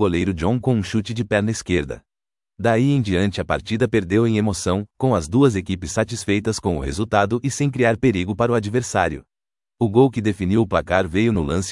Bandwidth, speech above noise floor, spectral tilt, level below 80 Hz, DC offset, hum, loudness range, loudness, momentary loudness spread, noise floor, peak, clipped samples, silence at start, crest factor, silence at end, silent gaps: 12 kHz; over 71 dB; -6 dB/octave; -42 dBFS; under 0.1%; none; 1 LU; -20 LUFS; 6 LU; under -90 dBFS; -2 dBFS; under 0.1%; 0 s; 18 dB; 0 s; none